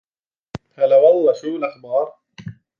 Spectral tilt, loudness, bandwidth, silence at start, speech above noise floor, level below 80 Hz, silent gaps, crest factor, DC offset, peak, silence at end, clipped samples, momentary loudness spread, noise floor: -7 dB/octave; -17 LUFS; 7 kHz; 0.55 s; over 74 dB; -60 dBFS; none; 16 dB; under 0.1%; -2 dBFS; 0.25 s; under 0.1%; 25 LU; under -90 dBFS